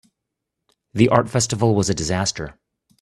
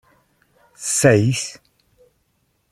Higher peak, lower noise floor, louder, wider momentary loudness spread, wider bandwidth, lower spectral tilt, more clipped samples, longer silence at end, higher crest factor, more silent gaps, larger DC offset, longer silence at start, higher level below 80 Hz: about the same, 0 dBFS vs -2 dBFS; first, -81 dBFS vs -67 dBFS; about the same, -19 LUFS vs -18 LUFS; about the same, 15 LU vs 15 LU; second, 12.5 kHz vs 15.5 kHz; about the same, -5 dB/octave vs -4.5 dB/octave; neither; second, 0.5 s vs 1.2 s; about the same, 22 dB vs 20 dB; neither; neither; first, 0.95 s vs 0.8 s; first, -48 dBFS vs -56 dBFS